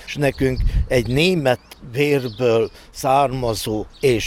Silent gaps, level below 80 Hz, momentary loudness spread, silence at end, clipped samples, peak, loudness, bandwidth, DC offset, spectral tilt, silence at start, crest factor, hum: none; -30 dBFS; 8 LU; 0 s; under 0.1%; -4 dBFS; -20 LUFS; 17 kHz; under 0.1%; -5.5 dB/octave; 0 s; 14 dB; none